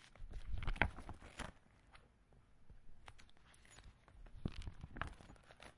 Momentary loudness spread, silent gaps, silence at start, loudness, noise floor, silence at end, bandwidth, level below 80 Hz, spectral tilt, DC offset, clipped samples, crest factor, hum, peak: 26 LU; none; 0 s; -47 LUFS; -68 dBFS; 0.05 s; 11.5 kHz; -52 dBFS; -5 dB/octave; under 0.1%; under 0.1%; 34 dB; none; -14 dBFS